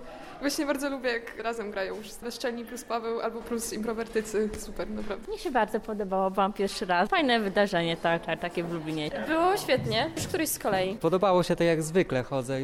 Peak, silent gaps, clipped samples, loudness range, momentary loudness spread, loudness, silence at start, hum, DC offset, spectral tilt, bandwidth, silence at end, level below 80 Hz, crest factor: -14 dBFS; none; under 0.1%; 6 LU; 10 LU; -28 LUFS; 0 s; none; under 0.1%; -4.5 dB/octave; 16 kHz; 0 s; -52 dBFS; 14 dB